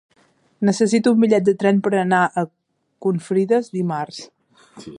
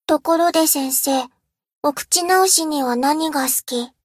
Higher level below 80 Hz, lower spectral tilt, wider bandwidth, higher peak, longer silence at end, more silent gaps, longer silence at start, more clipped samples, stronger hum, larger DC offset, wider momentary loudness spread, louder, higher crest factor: second, -68 dBFS vs -62 dBFS; first, -6.5 dB/octave vs -0.5 dB/octave; second, 11 kHz vs 16 kHz; about the same, -4 dBFS vs -2 dBFS; second, 0 s vs 0.15 s; second, none vs 1.78-1.82 s; first, 0.6 s vs 0.1 s; neither; neither; neither; about the same, 11 LU vs 9 LU; about the same, -19 LUFS vs -17 LUFS; about the same, 16 dB vs 16 dB